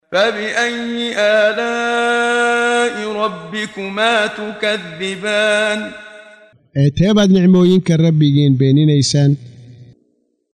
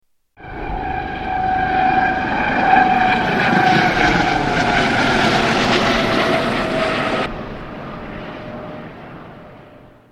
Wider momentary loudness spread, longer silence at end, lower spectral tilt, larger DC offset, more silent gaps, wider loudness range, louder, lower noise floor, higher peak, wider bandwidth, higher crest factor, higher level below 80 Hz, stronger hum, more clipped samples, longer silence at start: second, 11 LU vs 17 LU; first, 0.7 s vs 0.4 s; about the same, -5.5 dB/octave vs -5 dB/octave; neither; neither; second, 5 LU vs 9 LU; about the same, -15 LUFS vs -16 LUFS; first, -62 dBFS vs -43 dBFS; about the same, -2 dBFS vs 0 dBFS; second, 10.5 kHz vs 13 kHz; about the same, 14 dB vs 18 dB; second, -48 dBFS vs -36 dBFS; neither; neither; second, 0.1 s vs 0.4 s